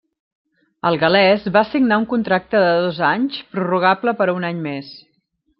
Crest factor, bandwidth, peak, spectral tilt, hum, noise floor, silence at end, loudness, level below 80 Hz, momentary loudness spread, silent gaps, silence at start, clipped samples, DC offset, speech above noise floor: 16 dB; 5.8 kHz; -2 dBFS; -9.5 dB/octave; none; -66 dBFS; 0.6 s; -17 LUFS; -58 dBFS; 10 LU; none; 0.85 s; under 0.1%; under 0.1%; 49 dB